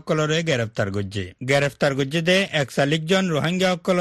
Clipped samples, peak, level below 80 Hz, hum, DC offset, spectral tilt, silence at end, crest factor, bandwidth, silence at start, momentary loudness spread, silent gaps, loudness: under 0.1%; -4 dBFS; -56 dBFS; none; under 0.1%; -5 dB/octave; 0 s; 16 dB; 12.5 kHz; 0.05 s; 7 LU; none; -21 LUFS